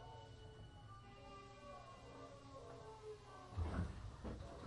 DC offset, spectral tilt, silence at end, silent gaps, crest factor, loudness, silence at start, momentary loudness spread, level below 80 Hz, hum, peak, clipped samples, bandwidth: under 0.1%; -6.5 dB/octave; 0 s; none; 22 dB; -53 LUFS; 0 s; 12 LU; -56 dBFS; none; -30 dBFS; under 0.1%; 11.5 kHz